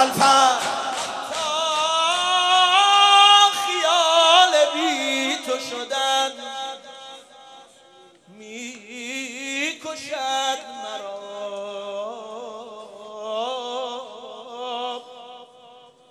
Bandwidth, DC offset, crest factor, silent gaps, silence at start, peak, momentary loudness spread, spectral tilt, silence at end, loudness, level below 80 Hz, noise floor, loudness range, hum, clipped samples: 15 kHz; under 0.1%; 20 dB; none; 0 s; -2 dBFS; 22 LU; -0.5 dB/octave; 0.65 s; -18 LUFS; -70 dBFS; -51 dBFS; 17 LU; none; under 0.1%